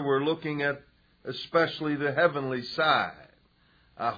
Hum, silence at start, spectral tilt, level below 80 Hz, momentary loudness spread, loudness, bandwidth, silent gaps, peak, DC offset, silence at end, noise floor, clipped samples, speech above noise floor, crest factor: none; 0 s; -6.5 dB/octave; -66 dBFS; 13 LU; -27 LUFS; 5 kHz; none; -10 dBFS; under 0.1%; 0 s; -64 dBFS; under 0.1%; 36 dB; 18 dB